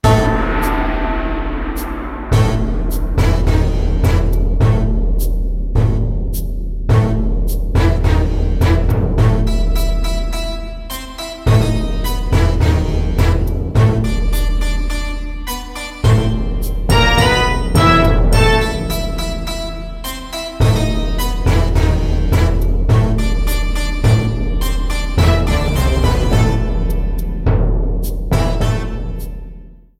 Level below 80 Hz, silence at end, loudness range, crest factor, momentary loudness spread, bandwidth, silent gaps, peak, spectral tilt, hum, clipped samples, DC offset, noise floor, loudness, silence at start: -16 dBFS; 0.25 s; 4 LU; 14 dB; 11 LU; 15.5 kHz; none; 0 dBFS; -6 dB/octave; none; under 0.1%; under 0.1%; -35 dBFS; -17 LUFS; 0.05 s